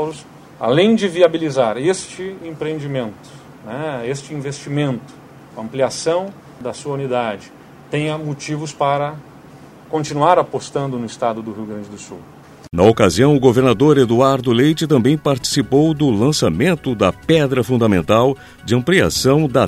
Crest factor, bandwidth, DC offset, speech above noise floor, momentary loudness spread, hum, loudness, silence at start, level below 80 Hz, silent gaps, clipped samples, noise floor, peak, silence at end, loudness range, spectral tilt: 16 dB; 15 kHz; under 0.1%; 24 dB; 16 LU; none; -17 LUFS; 0 s; -46 dBFS; none; under 0.1%; -41 dBFS; 0 dBFS; 0 s; 9 LU; -5.5 dB/octave